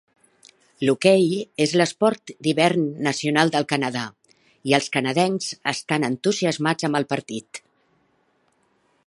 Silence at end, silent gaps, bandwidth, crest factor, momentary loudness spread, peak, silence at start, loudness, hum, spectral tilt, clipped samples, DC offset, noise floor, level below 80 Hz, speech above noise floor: 1.5 s; none; 11.5 kHz; 22 dB; 9 LU; 0 dBFS; 0.8 s; -21 LUFS; none; -4.5 dB/octave; under 0.1%; under 0.1%; -65 dBFS; -68 dBFS; 44 dB